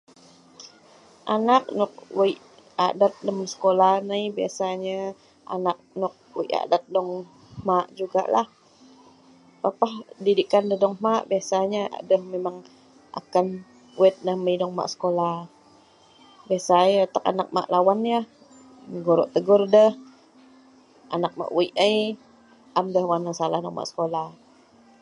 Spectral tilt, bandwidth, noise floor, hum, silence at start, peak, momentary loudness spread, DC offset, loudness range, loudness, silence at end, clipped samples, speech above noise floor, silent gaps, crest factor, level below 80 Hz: -5.5 dB/octave; 11 kHz; -55 dBFS; none; 0.6 s; -4 dBFS; 13 LU; under 0.1%; 5 LU; -23 LUFS; 0.7 s; under 0.1%; 32 dB; none; 20 dB; -72 dBFS